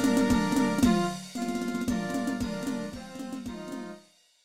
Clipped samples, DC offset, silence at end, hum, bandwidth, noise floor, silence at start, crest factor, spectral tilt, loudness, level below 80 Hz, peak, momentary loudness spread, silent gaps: under 0.1%; 0.2%; 0.4 s; none; 16.5 kHz; -56 dBFS; 0 s; 18 dB; -5 dB/octave; -29 LUFS; -48 dBFS; -10 dBFS; 15 LU; none